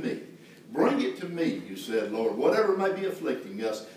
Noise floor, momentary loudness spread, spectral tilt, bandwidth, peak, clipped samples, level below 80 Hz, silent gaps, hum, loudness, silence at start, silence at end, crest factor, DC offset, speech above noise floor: -48 dBFS; 11 LU; -5.5 dB/octave; 16 kHz; -12 dBFS; under 0.1%; -84 dBFS; none; none; -28 LUFS; 0 s; 0 s; 18 dB; under 0.1%; 20 dB